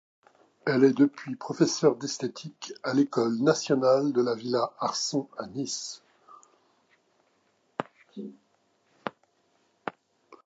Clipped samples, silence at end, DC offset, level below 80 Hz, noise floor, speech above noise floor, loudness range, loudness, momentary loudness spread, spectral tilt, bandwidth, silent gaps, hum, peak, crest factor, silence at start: under 0.1%; 0.55 s; under 0.1%; -78 dBFS; -70 dBFS; 43 dB; 18 LU; -27 LUFS; 18 LU; -5 dB/octave; 8 kHz; none; none; -8 dBFS; 20 dB; 0.65 s